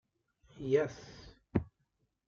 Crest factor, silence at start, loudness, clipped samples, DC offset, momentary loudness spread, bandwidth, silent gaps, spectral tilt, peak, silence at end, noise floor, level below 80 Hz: 22 dB; 0.55 s; -35 LUFS; under 0.1%; under 0.1%; 22 LU; 7.2 kHz; none; -7.5 dB/octave; -16 dBFS; 0.65 s; -80 dBFS; -60 dBFS